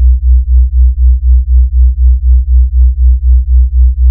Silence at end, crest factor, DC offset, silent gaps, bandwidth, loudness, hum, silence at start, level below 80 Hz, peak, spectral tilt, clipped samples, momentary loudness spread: 0 s; 6 dB; under 0.1%; none; 0.2 kHz; -9 LUFS; none; 0 s; -6 dBFS; 0 dBFS; -15.5 dB/octave; 0.7%; 2 LU